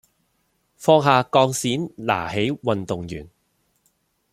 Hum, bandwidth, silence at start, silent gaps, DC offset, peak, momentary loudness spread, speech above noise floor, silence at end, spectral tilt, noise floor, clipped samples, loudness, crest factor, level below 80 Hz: none; 15 kHz; 0.8 s; none; under 0.1%; -2 dBFS; 13 LU; 48 dB; 1.05 s; -5 dB/octave; -69 dBFS; under 0.1%; -21 LUFS; 20 dB; -56 dBFS